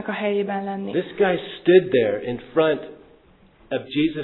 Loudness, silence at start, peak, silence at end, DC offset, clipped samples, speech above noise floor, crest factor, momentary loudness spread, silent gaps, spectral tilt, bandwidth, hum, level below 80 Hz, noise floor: -22 LUFS; 0 s; -4 dBFS; 0 s; under 0.1%; under 0.1%; 32 dB; 18 dB; 12 LU; none; -10 dB/octave; 4.2 kHz; none; -56 dBFS; -53 dBFS